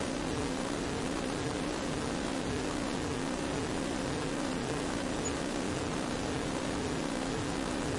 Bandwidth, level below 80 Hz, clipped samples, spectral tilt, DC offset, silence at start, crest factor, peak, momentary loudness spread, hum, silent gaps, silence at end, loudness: 11.5 kHz; -48 dBFS; under 0.1%; -4.5 dB/octave; under 0.1%; 0 s; 14 dB; -20 dBFS; 0 LU; none; none; 0 s; -34 LUFS